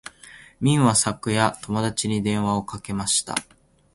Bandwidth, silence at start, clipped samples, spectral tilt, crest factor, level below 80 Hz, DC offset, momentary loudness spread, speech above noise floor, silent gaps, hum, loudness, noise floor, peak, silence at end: 11.5 kHz; 0.25 s; under 0.1%; -4 dB/octave; 20 dB; -52 dBFS; under 0.1%; 11 LU; 25 dB; none; none; -22 LUFS; -47 dBFS; -4 dBFS; 0.55 s